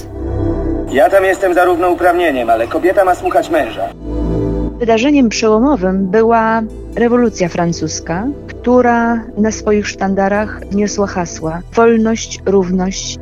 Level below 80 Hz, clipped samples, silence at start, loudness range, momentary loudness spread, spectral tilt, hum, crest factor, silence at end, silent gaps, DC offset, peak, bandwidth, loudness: -30 dBFS; under 0.1%; 0 s; 2 LU; 9 LU; -5.5 dB/octave; none; 14 dB; 0 s; none; 0.3%; 0 dBFS; 15.5 kHz; -14 LUFS